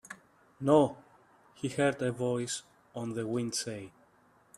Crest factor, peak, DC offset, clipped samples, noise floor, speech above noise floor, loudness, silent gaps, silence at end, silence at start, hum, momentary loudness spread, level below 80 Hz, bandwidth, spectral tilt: 22 dB; -10 dBFS; under 0.1%; under 0.1%; -65 dBFS; 34 dB; -32 LUFS; none; 0.7 s; 0.1 s; none; 22 LU; -70 dBFS; 13 kHz; -5 dB/octave